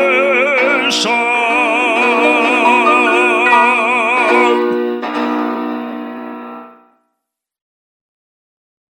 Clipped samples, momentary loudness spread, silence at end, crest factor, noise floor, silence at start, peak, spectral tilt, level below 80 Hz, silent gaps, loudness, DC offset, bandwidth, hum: under 0.1%; 14 LU; 2.2 s; 14 dB; -76 dBFS; 0 s; 0 dBFS; -2.5 dB/octave; -80 dBFS; none; -12 LUFS; under 0.1%; 16.5 kHz; none